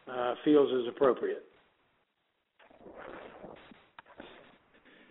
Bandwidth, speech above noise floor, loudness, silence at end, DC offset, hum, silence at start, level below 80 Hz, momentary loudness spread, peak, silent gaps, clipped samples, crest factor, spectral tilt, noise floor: 4 kHz; 51 dB; -29 LUFS; 0.8 s; under 0.1%; none; 0.05 s; -74 dBFS; 26 LU; -14 dBFS; none; under 0.1%; 20 dB; -4 dB/octave; -79 dBFS